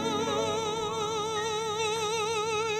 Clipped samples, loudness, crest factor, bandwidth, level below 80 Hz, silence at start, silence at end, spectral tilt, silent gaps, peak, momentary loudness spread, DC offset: under 0.1%; -29 LUFS; 12 dB; 16 kHz; -64 dBFS; 0 s; 0 s; -2.5 dB/octave; none; -18 dBFS; 2 LU; under 0.1%